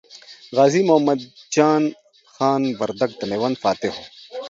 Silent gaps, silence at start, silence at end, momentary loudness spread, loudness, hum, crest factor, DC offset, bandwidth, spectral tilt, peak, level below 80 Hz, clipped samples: none; 0.15 s; 0 s; 10 LU; -20 LUFS; none; 20 dB; under 0.1%; 7.8 kHz; -5.5 dB/octave; -2 dBFS; -64 dBFS; under 0.1%